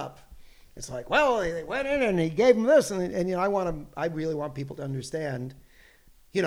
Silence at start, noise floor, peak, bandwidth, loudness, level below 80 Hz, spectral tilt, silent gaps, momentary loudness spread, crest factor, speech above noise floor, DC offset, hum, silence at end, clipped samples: 0 s; -56 dBFS; -6 dBFS; 15.5 kHz; -26 LUFS; -50 dBFS; -5.5 dB/octave; none; 15 LU; 20 dB; 30 dB; under 0.1%; none; 0 s; under 0.1%